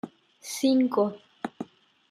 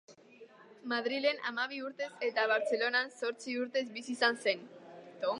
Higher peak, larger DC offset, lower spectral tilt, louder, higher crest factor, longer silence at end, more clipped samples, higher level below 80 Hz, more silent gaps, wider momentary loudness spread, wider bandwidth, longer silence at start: about the same, -12 dBFS vs -14 dBFS; neither; first, -4.5 dB/octave vs -2.5 dB/octave; first, -26 LUFS vs -33 LUFS; about the same, 16 dB vs 20 dB; first, 0.45 s vs 0 s; neither; first, -78 dBFS vs under -90 dBFS; neither; first, 20 LU vs 10 LU; first, 14.5 kHz vs 11 kHz; about the same, 0.05 s vs 0.1 s